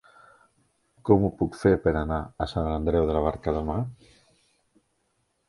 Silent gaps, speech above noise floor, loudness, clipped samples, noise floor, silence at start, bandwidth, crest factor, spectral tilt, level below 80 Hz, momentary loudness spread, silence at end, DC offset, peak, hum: none; 48 dB; -26 LUFS; under 0.1%; -73 dBFS; 1.05 s; 11.5 kHz; 24 dB; -8.5 dB/octave; -40 dBFS; 9 LU; 1.55 s; under 0.1%; -4 dBFS; none